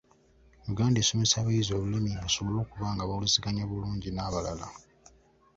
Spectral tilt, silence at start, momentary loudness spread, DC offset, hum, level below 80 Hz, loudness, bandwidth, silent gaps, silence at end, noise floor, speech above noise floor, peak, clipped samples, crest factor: -4 dB/octave; 0.65 s; 11 LU; under 0.1%; none; -48 dBFS; -29 LUFS; 7.8 kHz; none; 0.75 s; -61 dBFS; 32 dB; -10 dBFS; under 0.1%; 20 dB